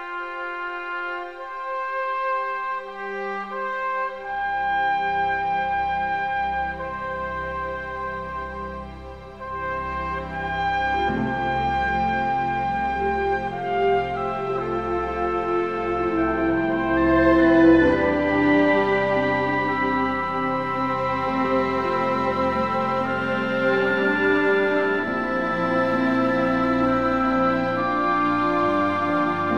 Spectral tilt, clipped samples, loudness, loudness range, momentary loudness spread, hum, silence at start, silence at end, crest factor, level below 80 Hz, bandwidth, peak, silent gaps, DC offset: -7 dB/octave; under 0.1%; -22 LUFS; 9 LU; 10 LU; none; 0 s; 0 s; 16 dB; -44 dBFS; 7.6 kHz; -6 dBFS; none; 0.3%